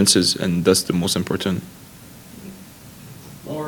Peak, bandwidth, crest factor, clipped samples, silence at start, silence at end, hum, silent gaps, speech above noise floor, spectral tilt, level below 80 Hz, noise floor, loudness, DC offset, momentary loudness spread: 0 dBFS; 19 kHz; 22 dB; under 0.1%; 0 s; 0 s; none; none; 23 dB; -3.5 dB/octave; -52 dBFS; -42 dBFS; -19 LUFS; under 0.1%; 24 LU